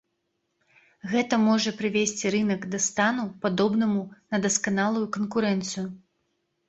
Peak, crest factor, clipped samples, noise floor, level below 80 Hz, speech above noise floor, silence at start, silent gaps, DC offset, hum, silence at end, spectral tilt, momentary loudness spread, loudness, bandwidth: -8 dBFS; 18 dB; under 0.1%; -77 dBFS; -66 dBFS; 52 dB; 1.05 s; none; under 0.1%; none; 0.7 s; -4 dB/octave; 8 LU; -25 LUFS; 8.2 kHz